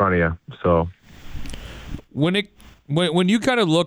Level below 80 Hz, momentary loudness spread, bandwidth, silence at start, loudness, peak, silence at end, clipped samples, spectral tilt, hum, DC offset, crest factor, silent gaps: -40 dBFS; 19 LU; 16 kHz; 0 s; -21 LUFS; -6 dBFS; 0 s; under 0.1%; -6 dB/octave; none; under 0.1%; 16 dB; none